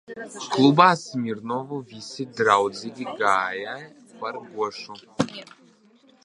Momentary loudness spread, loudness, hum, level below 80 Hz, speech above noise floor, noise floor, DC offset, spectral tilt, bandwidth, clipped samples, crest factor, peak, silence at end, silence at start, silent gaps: 19 LU; -23 LUFS; none; -70 dBFS; 33 dB; -57 dBFS; under 0.1%; -5 dB/octave; 11 kHz; under 0.1%; 24 dB; -2 dBFS; 0.8 s; 0.1 s; none